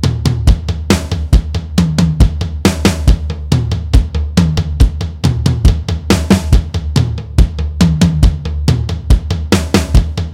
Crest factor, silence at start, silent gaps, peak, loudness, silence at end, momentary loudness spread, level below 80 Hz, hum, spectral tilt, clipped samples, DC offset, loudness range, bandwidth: 12 dB; 0 s; none; 0 dBFS; -14 LUFS; 0 s; 4 LU; -16 dBFS; none; -6 dB/octave; under 0.1%; under 0.1%; 1 LU; 16 kHz